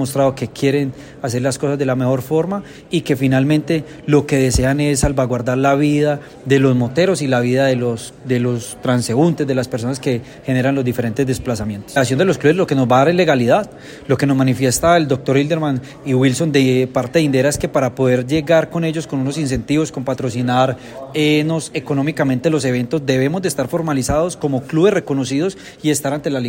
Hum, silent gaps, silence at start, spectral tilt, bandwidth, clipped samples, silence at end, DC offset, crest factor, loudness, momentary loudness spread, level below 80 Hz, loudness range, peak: none; none; 0 s; -6 dB/octave; 16.5 kHz; under 0.1%; 0 s; under 0.1%; 16 dB; -17 LUFS; 7 LU; -40 dBFS; 3 LU; -2 dBFS